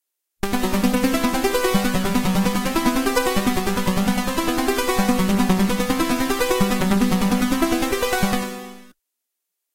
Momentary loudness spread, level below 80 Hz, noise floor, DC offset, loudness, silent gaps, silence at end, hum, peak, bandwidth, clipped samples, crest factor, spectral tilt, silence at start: 3 LU; -34 dBFS; -80 dBFS; under 0.1%; -20 LUFS; none; 0.85 s; none; -4 dBFS; 16 kHz; under 0.1%; 16 dB; -4.5 dB/octave; 0.45 s